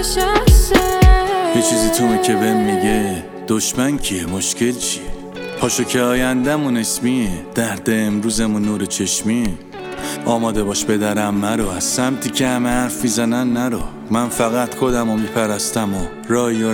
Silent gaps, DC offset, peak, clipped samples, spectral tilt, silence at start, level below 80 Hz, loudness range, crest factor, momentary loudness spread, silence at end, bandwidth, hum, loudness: none; under 0.1%; 0 dBFS; under 0.1%; -4.5 dB/octave; 0 s; -24 dBFS; 4 LU; 16 dB; 7 LU; 0 s; 19 kHz; none; -17 LUFS